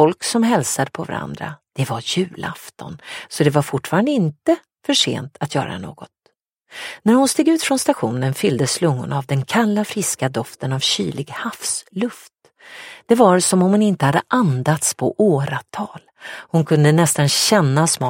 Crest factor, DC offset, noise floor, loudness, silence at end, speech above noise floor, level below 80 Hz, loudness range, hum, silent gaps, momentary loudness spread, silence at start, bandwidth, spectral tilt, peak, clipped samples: 18 dB; under 0.1%; -64 dBFS; -18 LUFS; 0 s; 46 dB; -60 dBFS; 5 LU; none; 6.52-6.56 s; 16 LU; 0 s; 16.5 kHz; -4.5 dB/octave; 0 dBFS; under 0.1%